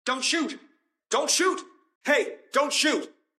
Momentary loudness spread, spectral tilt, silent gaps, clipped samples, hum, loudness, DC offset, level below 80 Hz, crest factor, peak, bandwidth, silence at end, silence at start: 12 LU; 0 dB/octave; 1.95-2.01 s; under 0.1%; none; -25 LUFS; under 0.1%; under -90 dBFS; 16 dB; -10 dBFS; 15.5 kHz; 0.3 s; 0.05 s